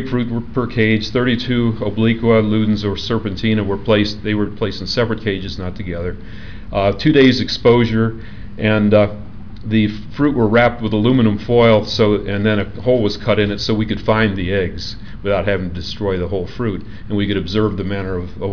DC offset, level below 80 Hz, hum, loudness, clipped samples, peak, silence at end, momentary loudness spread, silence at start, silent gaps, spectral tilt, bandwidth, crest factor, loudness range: 3%; -36 dBFS; none; -17 LUFS; under 0.1%; -4 dBFS; 0 s; 12 LU; 0 s; none; -7 dB/octave; 5.4 kHz; 14 dB; 5 LU